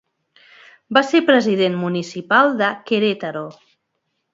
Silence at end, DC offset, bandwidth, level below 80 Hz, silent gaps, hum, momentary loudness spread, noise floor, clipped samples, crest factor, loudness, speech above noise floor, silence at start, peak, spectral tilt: 0.8 s; under 0.1%; 7.8 kHz; -70 dBFS; none; none; 12 LU; -73 dBFS; under 0.1%; 20 dB; -17 LUFS; 56 dB; 0.9 s; 0 dBFS; -5.5 dB/octave